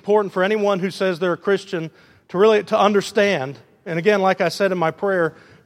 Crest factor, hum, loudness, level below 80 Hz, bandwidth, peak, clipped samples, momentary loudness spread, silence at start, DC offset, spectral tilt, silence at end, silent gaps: 18 dB; none; -19 LUFS; -70 dBFS; 14 kHz; -2 dBFS; under 0.1%; 12 LU; 0.05 s; under 0.1%; -5.5 dB/octave; 0.35 s; none